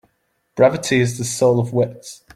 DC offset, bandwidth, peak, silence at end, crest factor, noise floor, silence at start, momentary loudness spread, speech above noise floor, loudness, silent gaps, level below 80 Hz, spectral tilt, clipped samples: under 0.1%; 16 kHz; -2 dBFS; 0.2 s; 16 dB; -68 dBFS; 0.55 s; 11 LU; 50 dB; -18 LUFS; none; -56 dBFS; -5.5 dB/octave; under 0.1%